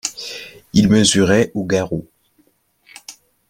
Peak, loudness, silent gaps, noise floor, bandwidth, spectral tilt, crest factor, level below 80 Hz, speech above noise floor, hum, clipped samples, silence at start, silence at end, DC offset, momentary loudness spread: -2 dBFS; -16 LUFS; none; -60 dBFS; 16 kHz; -4.5 dB/octave; 18 dB; -48 dBFS; 45 dB; none; under 0.1%; 0.05 s; 0.4 s; under 0.1%; 24 LU